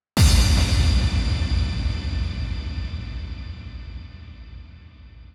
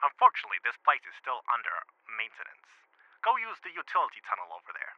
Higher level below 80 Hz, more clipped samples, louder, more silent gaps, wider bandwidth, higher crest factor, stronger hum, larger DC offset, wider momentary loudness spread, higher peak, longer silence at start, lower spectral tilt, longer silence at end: first, -24 dBFS vs under -90 dBFS; neither; first, -22 LUFS vs -31 LUFS; neither; first, 15 kHz vs 6.6 kHz; second, 16 dB vs 24 dB; neither; neither; first, 23 LU vs 15 LU; about the same, -6 dBFS vs -8 dBFS; first, 0.15 s vs 0 s; first, -4.5 dB/octave vs -1 dB/octave; about the same, 0.1 s vs 0.05 s